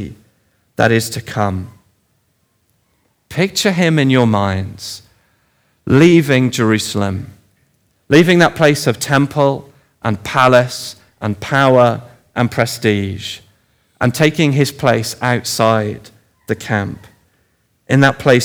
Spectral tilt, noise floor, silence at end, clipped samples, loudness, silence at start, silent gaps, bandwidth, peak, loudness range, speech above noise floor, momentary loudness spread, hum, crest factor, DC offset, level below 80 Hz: -5.5 dB/octave; -62 dBFS; 0 s; under 0.1%; -14 LUFS; 0 s; none; over 20 kHz; 0 dBFS; 5 LU; 48 dB; 16 LU; none; 16 dB; under 0.1%; -52 dBFS